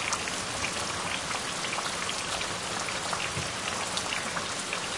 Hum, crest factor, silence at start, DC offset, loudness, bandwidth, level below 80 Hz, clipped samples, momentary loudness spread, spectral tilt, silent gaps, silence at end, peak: none; 20 dB; 0 s; under 0.1%; -30 LUFS; 11.5 kHz; -56 dBFS; under 0.1%; 1 LU; -1.5 dB/octave; none; 0 s; -12 dBFS